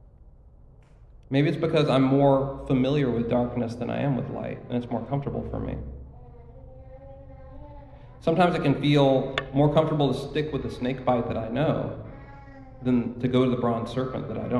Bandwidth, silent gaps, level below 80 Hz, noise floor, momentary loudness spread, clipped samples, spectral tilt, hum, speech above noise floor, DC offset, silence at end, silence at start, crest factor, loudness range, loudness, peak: 11 kHz; none; -46 dBFS; -51 dBFS; 23 LU; under 0.1%; -8 dB/octave; none; 27 dB; under 0.1%; 0 s; 0.2 s; 18 dB; 10 LU; -25 LUFS; -8 dBFS